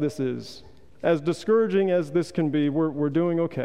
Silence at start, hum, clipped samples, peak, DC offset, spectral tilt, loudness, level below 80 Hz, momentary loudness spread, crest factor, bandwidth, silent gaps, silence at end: 0 s; none; under 0.1%; -10 dBFS; 0.4%; -7.5 dB/octave; -24 LUFS; -62 dBFS; 8 LU; 14 dB; 11.5 kHz; none; 0 s